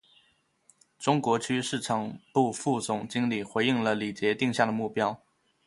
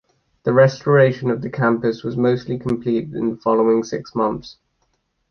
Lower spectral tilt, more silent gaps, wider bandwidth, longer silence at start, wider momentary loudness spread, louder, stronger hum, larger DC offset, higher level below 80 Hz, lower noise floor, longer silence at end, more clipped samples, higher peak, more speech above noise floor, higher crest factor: second, -5 dB/octave vs -7.5 dB/octave; neither; first, 11.5 kHz vs 6.8 kHz; first, 1 s vs 0.45 s; second, 5 LU vs 9 LU; second, -28 LUFS vs -19 LUFS; neither; neither; second, -68 dBFS vs -54 dBFS; about the same, -68 dBFS vs -68 dBFS; second, 0.5 s vs 0.8 s; neither; second, -8 dBFS vs -2 dBFS; second, 41 dB vs 50 dB; about the same, 22 dB vs 18 dB